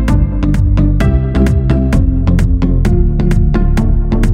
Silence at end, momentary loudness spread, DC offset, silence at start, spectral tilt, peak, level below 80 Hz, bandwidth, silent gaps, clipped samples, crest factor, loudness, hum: 0 s; 2 LU; under 0.1%; 0 s; -8.5 dB/octave; 0 dBFS; -12 dBFS; 9.4 kHz; none; under 0.1%; 10 dB; -13 LUFS; none